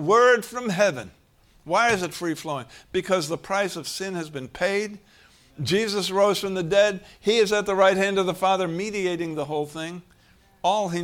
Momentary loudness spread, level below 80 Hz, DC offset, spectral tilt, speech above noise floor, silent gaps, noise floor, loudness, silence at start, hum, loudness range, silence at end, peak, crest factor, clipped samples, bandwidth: 13 LU; -58 dBFS; under 0.1%; -4 dB/octave; 34 dB; none; -57 dBFS; -24 LUFS; 0 s; none; 5 LU; 0 s; -6 dBFS; 18 dB; under 0.1%; 17.5 kHz